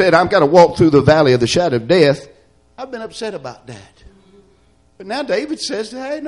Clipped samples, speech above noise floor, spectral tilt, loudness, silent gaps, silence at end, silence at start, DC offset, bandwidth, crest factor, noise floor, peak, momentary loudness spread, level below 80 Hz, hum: under 0.1%; 40 dB; -5.5 dB/octave; -14 LUFS; none; 0 s; 0 s; under 0.1%; 11.5 kHz; 16 dB; -54 dBFS; 0 dBFS; 19 LU; -46 dBFS; none